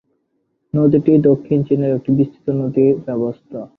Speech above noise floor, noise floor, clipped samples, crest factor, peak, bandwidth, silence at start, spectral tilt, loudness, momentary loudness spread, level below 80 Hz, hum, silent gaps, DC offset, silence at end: 52 dB; -68 dBFS; under 0.1%; 14 dB; -2 dBFS; 4 kHz; 0.75 s; -12 dB/octave; -16 LUFS; 10 LU; -54 dBFS; none; none; under 0.1%; 0.1 s